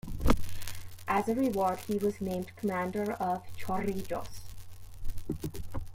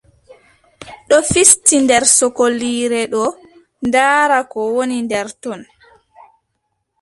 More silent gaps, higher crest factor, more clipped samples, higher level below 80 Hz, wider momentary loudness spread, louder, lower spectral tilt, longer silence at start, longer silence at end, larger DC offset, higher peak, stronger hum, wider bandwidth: neither; first, 22 dB vs 16 dB; neither; first, -40 dBFS vs -48 dBFS; first, 17 LU vs 14 LU; second, -33 LUFS vs -13 LUFS; first, -6 dB/octave vs -2 dB/octave; second, 0.05 s vs 0.8 s; second, 0 s vs 1.4 s; neither; second, -8 dBFS vs 0 dBFS; neither; about the same, 16.5 kHz vs 16 kHz